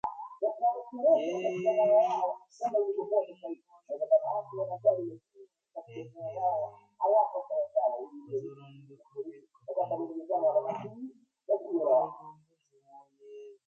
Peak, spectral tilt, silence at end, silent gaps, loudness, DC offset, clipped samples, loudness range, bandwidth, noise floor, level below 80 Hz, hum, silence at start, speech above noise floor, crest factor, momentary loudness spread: -14 dBFS; -7 dB/octave; 0.15 s; none; -30 LUFS; under 0.1%; under 0.1%; 5 LU; 7 kHz; -68 dBFS; -82 dBFS; none; 0.05 s; 38 dB; 18 dB; 19 LU